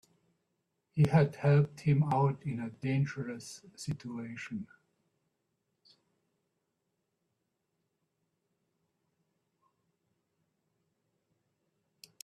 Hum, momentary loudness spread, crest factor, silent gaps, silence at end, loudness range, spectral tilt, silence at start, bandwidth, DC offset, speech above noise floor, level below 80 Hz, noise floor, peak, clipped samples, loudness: none; 16 LU; 22 dB; none; 7.6 s; 17 LU; -7.5 dB/octave; 0.95 s; 11 kHz; under 0.1%; 52 dB; -68 dBFS; -83 dBFS; -14 dBFS; under 0.1%; -31 LUFS